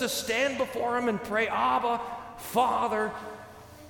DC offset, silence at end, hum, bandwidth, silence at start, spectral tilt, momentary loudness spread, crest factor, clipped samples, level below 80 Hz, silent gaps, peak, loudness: under 0.1%; 0 s; none; 19 kHz; 0 s; -3 dB/octave; 14 LU; 18 dB; under 0.1%; -60 dBFS; none; -10 dBFS; -28 LUFS